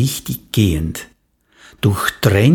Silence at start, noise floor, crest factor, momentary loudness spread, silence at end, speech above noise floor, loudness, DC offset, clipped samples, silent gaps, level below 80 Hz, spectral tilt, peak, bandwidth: 0 s; -55 dBFS; 16 dB; 10 LU; 0 s; 40 dB; -18 LUFS; under 0.1%; under 0.1%; none; -34 dBFS; -5.5 dB/octave; 0 dBFS; 19 kHz